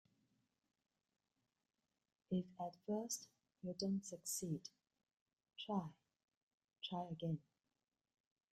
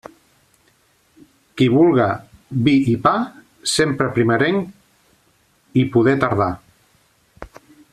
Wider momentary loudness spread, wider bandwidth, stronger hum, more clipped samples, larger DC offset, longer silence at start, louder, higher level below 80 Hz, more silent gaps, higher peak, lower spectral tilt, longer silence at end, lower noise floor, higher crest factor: second, 11 LU vs 14 LU; about the same, 13.5 kHz vs 13.5 kHz; neither; neither; neither; first, 2.3 s vs 1.55 s; second, -46 LUFS vs -18 LUFS; second, -84 dBFS vs -52 dBFS; first, 5.21-5.26 s, 6.24-6.28 s, 6.37-6.58 s vs none; second, -30 dBFS vs -2 dBFS; about the same, -5 dB/octave vs -6 dB/octave; first, 1.15 s vs 0.45 s; first, under -90 dBFS vs -59 dBFS; about the same, 20 dB vs 16 dB